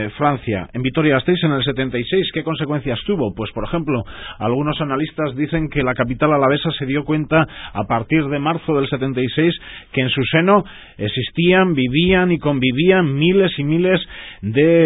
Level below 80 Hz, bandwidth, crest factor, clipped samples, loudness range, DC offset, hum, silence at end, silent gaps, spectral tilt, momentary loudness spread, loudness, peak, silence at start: -42 dBFS; 4 kHz; 16 dB; under 0.1%; 5 LU; under 0.1%; none; 0 s; none; -12 dB/octave; 8 LU; -18 LUFS; 0 dBFS; 0 s